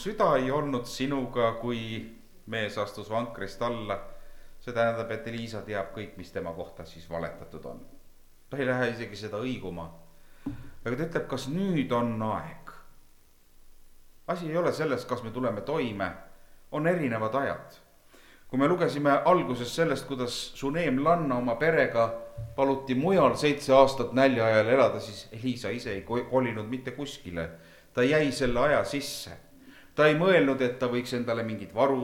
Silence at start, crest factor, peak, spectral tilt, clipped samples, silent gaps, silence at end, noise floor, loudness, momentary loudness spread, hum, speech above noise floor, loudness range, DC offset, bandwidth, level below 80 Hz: 0 s; 24 dB; -6 dBFS; -6 dB/octave; under 0.1%; none; 0 s; -56 dBFS; -28 LUFS; 16 LU; none; 29 dB; 10 LU; under 0.1%; 18 kHz; -52 dBFS